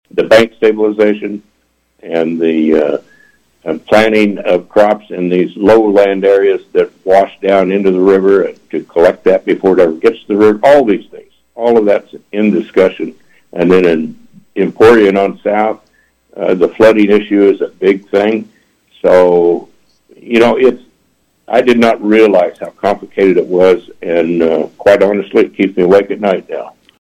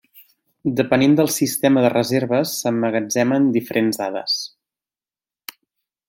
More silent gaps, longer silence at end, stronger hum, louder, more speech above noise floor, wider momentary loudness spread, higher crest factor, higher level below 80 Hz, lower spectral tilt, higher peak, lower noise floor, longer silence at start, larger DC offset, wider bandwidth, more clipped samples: neither; second, 0.35 s vs 1.6 s; neither; first, -11 LUFS vs -19 LUFS; second, 48 dB vs over 72 dB; second, 10 LU vs 15 LU; second, 10 dB vs 18 dB; first, -48 dBFS vs -62 dBFS; first, -6.5 dB/octave vs -4.5 dB/octave; about the same, 0 dBFS vs -2 dBFS; second, -58 dBFS vs under -90 dBFS; about the same, 0.15 s vs 0.15 s; neither; second, 12 kHz vs 17 kHz; neither